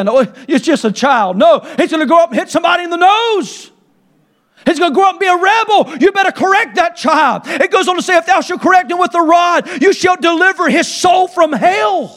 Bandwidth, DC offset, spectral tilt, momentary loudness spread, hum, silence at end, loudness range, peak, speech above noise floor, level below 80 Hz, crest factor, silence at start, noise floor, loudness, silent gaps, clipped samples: 13.5 kHz; under 0.1%; -3.5 dB/octave; 4 LU; none; 0.1 s; 2 LU; 0 dBFS; 44 dB; -58 dBFS; 12 dB; 0 s; -55 dBFS; -11 LUFS; none; under 0.1%